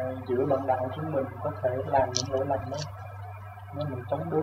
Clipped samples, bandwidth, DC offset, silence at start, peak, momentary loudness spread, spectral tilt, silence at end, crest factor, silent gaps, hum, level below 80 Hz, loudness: under 0.1%; 15.5 kHz; under 0.1%; 0 s; -8 dBFS; 15 LU; -5.5 dB/octave; 0 s; 22 dB; none; none; -56 dBFS; -29 LUFS